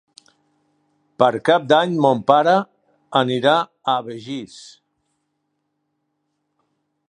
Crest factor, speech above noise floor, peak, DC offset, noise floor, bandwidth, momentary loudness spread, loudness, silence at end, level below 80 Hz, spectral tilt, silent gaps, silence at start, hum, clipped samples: 20 dB; 56 dB; 0 dBFS; under 0.1%; -73 dBFS; 10.5 kHz; 16 LU; -18 LUFS; 2.5 s; -68 dBFS; -5.5 dB/octave; none; 1.2 s; none; under 0.1%